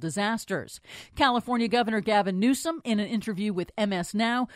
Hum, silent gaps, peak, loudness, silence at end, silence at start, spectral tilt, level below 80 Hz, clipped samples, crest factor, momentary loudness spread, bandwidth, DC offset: none; none; -8 dBFS; -27 LUFS; 0 s; 0 s; -4.5 dB/octave; -58 dBFS; under 0.1%; 18 dB; 9 LU; 15.5 kHz; under 0.1%